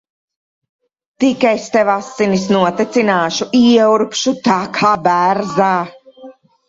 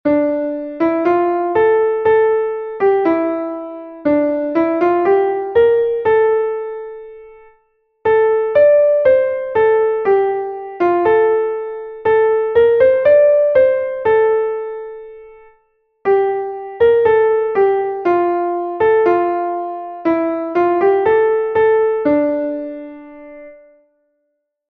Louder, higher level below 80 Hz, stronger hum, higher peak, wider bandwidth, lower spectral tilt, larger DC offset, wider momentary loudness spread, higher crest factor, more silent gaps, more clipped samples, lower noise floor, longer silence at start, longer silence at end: about the same, -14 LUFS vs -15 LUFS; about the same, -56 dBFS vs -54 dBFS; neither; about the same, 0 dBFS vs -2 dBFS; first, 7.8 kHz vs 4.6 kHz; second, -5 dB/octave vs -8.5 dB/octave; neither; second, 6 LU vs 13 LU; about the same, 14 dB vs 14 dB; neither; neither; second, -39 dBFS vs -71 dBFS; first, 1.2 s vs 0.05 s; second, 0.35 s vs 1.15 s